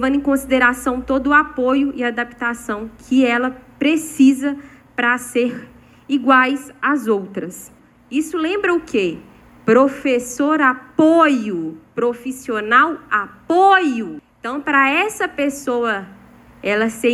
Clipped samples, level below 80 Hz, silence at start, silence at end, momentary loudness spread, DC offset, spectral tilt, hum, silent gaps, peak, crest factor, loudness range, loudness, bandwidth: under 0.1%; -50 dBFS; 0 s; 0 s; 13 LU; under 0.1%; -4 dB/octave; none; none; 0 dBFS; 16 dB; 3 LU; -17 LUFS; 13 kHz